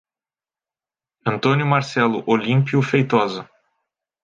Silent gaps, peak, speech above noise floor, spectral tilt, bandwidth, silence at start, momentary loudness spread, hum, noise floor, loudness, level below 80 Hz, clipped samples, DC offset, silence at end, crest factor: none; -2 dBFS; over 72 dB; -7 dB/octave; 7.6 kHz; 1.25 s; 8 LU; none; under -90 dBFS; -19 LUFS; -64 dBFS; under 0.1%; under 0.1%; 0.8 s; 18 dB